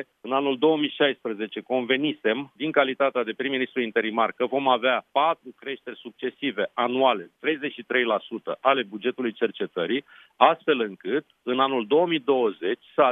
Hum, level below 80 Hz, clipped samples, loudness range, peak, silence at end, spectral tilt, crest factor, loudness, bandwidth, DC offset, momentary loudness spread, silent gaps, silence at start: none; -82 dBFS; under 0.1%; 2 LU; -2 dBFS; 0 s; -7.5 dB/octave; 22 dB; -25 LUFS; 3.9 kHz; under 0.1%; 8 LU; none; 0 s